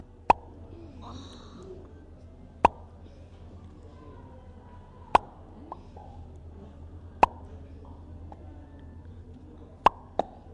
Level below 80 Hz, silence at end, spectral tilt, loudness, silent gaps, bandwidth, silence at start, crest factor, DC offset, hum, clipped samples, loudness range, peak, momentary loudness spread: -50 dBFS; 0 s; -6 dB/octave; -27 LUFS; none; 11 kHz; 0 s; 26 dB; under 0.1%; none; under 0.1%; 3 LU; -8 dBFS; 24 LU